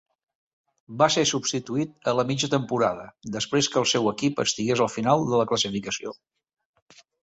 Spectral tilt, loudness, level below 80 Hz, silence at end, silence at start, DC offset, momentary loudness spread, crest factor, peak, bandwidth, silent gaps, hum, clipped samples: -4 dB/octave; -24 LUFS; -62 dBFS; 1.1 s; 0.9 s; under 0.1%; 9 LU; 20 dB; -6 dBFS; 8.4 kHz; none; none; under 0.1%